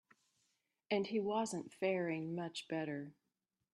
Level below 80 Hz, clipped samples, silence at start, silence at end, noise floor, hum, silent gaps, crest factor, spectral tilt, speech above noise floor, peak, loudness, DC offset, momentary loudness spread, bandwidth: -86 dBFS; under 0.1%; 0.9 s; 0.65 s; -89 dBFS; none; none; 20 dB; -5 dB/octave; 49 dB; -22 dBFS; -40 LUFS; under 0.1%; 7 LU; 12.5 kHz